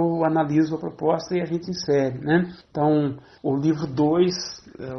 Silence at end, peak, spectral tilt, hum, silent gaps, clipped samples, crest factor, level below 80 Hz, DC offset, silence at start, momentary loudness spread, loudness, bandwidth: 0 s; -6 dBFS; -6.5 dB/octave; none; none; under 0.1%; 16 dB; -58 dBFS; under 0.1%; 0 s; 9 LU; -23 LUFS; 6.4 kHz